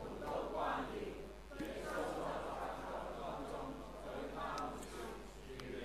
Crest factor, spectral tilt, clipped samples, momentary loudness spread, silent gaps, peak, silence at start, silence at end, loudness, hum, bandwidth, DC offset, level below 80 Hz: 16 dB; -5 dB/octave; under 0.1%; 9 LU; none; -28 dBFS; 0 s; 0 s; -45 LUFS; none; 16 kHz; under 0.1%; -58 dBFS